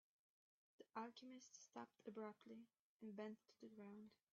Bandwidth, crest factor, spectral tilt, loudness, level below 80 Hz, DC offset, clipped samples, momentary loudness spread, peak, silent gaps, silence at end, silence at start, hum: 7.4 kHz; 22 dB; -4.5 dB/octave; -59 LUFS; under -90 dBFS; under 0.1%; under 0.1%; 9 LU; -38 dBFS; 2.79-3.00 s; 0.2 s; 0.8 s; none